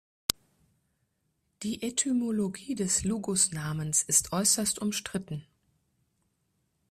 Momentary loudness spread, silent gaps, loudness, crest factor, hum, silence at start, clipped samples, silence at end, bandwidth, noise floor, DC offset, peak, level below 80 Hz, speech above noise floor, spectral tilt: 13 LU; none; -28 LUFS; 30 dB; none; 0.3 s; under 0.1%; 1.45 s; 15.5 kHz; -77 dBFS; under 0.1%; -2 dBFS; -60 dBFS; 47 dB; -3 dB/octave